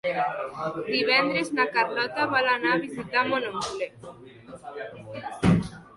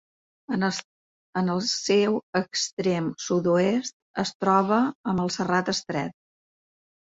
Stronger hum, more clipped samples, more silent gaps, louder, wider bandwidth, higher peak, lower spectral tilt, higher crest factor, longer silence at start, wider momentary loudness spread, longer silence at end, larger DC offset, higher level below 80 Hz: neither; neither; second, none vs 0.84-1.33 s, 2.23-2.33 s, 2.73-2.77 s, 3.93-4.14 s, 4.35-4.40 s, 4.95-5.04 s; about the same, -25 LUFS vs -25 LUFS; first, 11.5 kHz vs 8 kHz; about the same, -8 dBFS vs -6 dBFS; about the same, -5.5 dB/octave vs -4.5 dB/octave; about the same, 18 dB vs 20 dB; second, 0.05 s vs 0.5 s; first, 17 LU vs 9 LU; second, 0.1 s vs 0.9 s; neither; first, -52 dBFS vs -64 dBFS